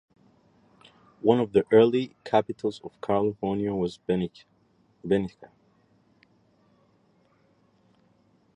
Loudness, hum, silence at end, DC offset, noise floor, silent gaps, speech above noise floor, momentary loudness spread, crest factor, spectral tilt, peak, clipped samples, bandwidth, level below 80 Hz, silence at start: -26 LUFS; none; 3.1 s; under 0.1%; -65 dBFS; none; 40 dB; 13 LU; 22 dB; -8 dB/octave; -6 dBFS; under 0.1%; 8.8 kHz; -60 dBFS; 1.25 s